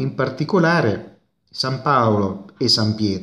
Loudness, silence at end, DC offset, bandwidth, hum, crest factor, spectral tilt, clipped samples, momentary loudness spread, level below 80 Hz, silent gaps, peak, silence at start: -19 LUFS; 0 s; under 0.1%; 13.5 kHz; none; 18 dB; -5.5 dB/octave; under 0.1%; 9 LU; -60 dBFS; none; -2 dBFS; 0 s